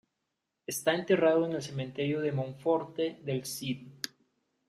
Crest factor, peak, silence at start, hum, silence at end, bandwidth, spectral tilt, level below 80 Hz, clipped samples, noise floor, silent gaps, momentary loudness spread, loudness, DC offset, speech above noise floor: 20 dB; -12 dBFS; 0.7 s; none; 0.6 s; 15.5 kHz; -5 dB/octave; -74 dBFS; under 0.1%; -84 dBFS; none; 13 LU; -31 LUFS; under 0.1%; 54 dB